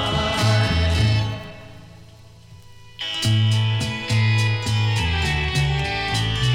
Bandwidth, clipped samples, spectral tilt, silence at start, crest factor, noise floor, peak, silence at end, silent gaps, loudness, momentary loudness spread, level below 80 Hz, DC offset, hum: 13.5 kHz; under 0.1%; -5 dB/octave; 0 s; 14 dB; -45 dBFS; -8 dBFS; 0 s; none; -21 LUFS; 8 LU; -34 dBFS; under 0.1%; none